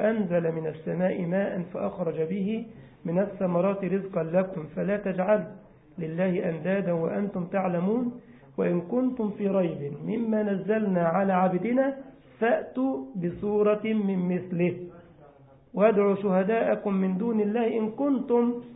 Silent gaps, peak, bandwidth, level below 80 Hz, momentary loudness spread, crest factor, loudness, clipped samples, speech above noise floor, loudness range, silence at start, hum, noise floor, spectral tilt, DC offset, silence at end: none; -10 dBFS; 3.9 kHz; -64 dBFS; 8 LU; 18 dB; -27 LUFS; under 0.1%; 28 dB; 3 LU; 0 s; none; -54 dBFS; -12 dB/octave; under 0.1%; 0 s